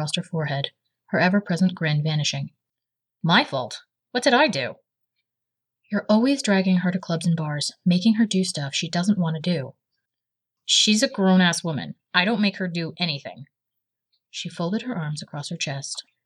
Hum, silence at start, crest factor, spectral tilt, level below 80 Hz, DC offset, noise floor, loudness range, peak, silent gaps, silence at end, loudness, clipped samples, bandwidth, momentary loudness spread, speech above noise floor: none; 0 s; 20 dB; -4.5 dB/octave; -78 dBFS; under 0.1%; -86 dBFS; 5 LU; -4 dBFS; none; 0.25 s; -23 LUFS; under 0.1%; 12 kHz; 13 LU; 63 dB